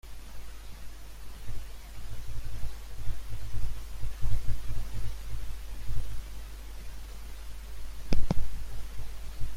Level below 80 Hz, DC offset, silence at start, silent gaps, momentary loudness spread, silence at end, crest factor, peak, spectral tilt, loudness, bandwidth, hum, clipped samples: -36 dBFS; under 0.1%; 0.05 s; none; 12 LU; 0 s; 18 dB; -8 dBFS; -5.5 dB/octave; -41 LUFS; 14.5 kHz; none; under 0.1%